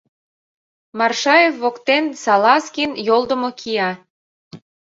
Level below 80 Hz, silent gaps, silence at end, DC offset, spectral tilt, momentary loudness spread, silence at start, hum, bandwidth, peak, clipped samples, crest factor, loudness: -64 dBFS; 4.10-4.51 s; 0.3 s; under 0.1%; -3 dB/octave; 9 LU; 0.95 s; none; 8 kHz; -2 dBFS; under 0.1%; 18 dB; -17 LUFS